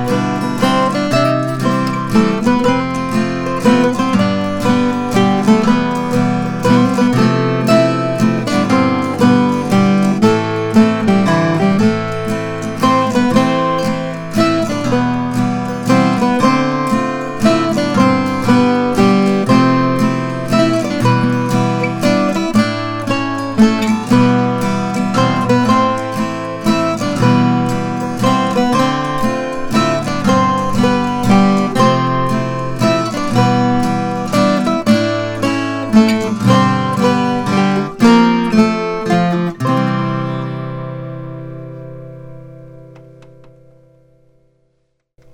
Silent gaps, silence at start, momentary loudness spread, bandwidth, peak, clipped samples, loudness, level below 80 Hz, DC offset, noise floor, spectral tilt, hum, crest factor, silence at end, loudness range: none; 0 s; 7 LU; 17.5 kHz; -2 dBFS; under 0.1%; -14 LUFS; -40 dBFS; under 0.1%; -64 dBFS; -6.5 dB/octave; none; 12 dB; 2.4 s; 2 LU